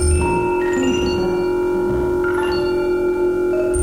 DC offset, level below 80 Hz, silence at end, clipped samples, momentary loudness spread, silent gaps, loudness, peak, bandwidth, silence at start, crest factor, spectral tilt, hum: under 0.1%; -28 dBFS; 0 s; under 0.1%; 1 LU; none; -18 LUFS; -8 dBFS; 12 kHz; 0 s; 10 dB; -6 dB/octave; none